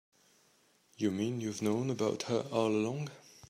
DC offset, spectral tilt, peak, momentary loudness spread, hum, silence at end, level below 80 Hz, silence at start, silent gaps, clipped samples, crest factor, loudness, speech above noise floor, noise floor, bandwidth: under 0.1%; -6 dB/octave; -16 dBFS; 5 LU; none; 0.3 s; -78 dBFS; 1 s; none; under 0.1%; 18 dB; -34 LUFS; 36 dB; -69 dBFS; 15 kHz